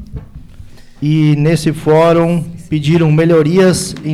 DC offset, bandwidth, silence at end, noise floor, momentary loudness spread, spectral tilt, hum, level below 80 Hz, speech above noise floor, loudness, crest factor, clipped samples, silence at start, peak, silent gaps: under 0.1%; 13.5 kHz; 0 s; -34 dBFS; 10 LU; -6.5 dB/octave; none; -38 dBFS; 23 dB; -12 LUFS; 10 dB; under 0.1%; 0 s; -2 dBFS; none